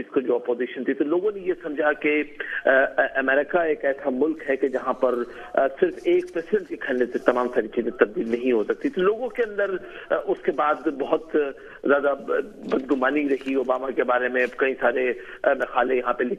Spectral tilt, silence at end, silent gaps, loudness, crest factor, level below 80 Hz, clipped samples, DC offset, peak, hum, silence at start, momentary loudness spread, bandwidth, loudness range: -6.5 dB/octave; 0 s; none; -24 LUFS; 22 dB; -58 dBFS; under 0.1%; under 0.1%; -2 dBFS; none; 0 s; 6 LU; 9.4 kHz; 2 LU